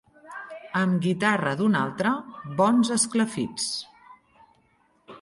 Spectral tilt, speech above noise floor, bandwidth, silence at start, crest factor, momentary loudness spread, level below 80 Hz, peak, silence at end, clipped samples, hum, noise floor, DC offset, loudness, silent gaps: -4.5 dB/octave; 41 dB; 11.5 kHz; 0.25 s; 18 dB; 18 LU; -66 dBFS; -8 dBFS; 0.05 s; under 0.1%; none; -64 dBFS; under 0.1%; -24 LUFS; none